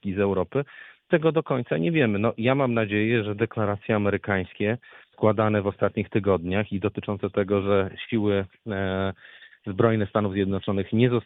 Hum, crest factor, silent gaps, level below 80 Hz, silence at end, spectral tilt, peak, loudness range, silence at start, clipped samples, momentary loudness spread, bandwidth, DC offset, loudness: none; 20 dB; none; -60 dBFS; 0.05 s; -10.5 dB/octave; -4 dBFS; 2 LU; 0.05 s; under 0.1%; 7 LU; 4 kHz; under 0.1%; -25 LUFS